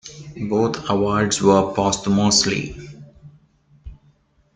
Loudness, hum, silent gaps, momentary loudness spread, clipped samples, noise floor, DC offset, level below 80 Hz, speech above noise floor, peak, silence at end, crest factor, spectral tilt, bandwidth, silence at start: -18 LUFS; none; none; 18 LU; under 0.1%; -58 dBFS; under 0.1%; -46 dBFS; 39 dB; -2 dBFS; 0.65 s; 18 dB; -4 dB/octave; 9.6 kHz; 0.05 s